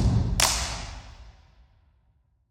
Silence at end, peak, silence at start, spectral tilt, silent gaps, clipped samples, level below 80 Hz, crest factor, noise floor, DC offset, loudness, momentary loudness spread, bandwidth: 1.2 s; -4 dBFS; 0 s; -3 dB/octave; none; under 0.1%; -34 dBFS; 24 dB; -66 dBFS; under 0.1%; -24 LUFS; 22 LU; 17.5 kHz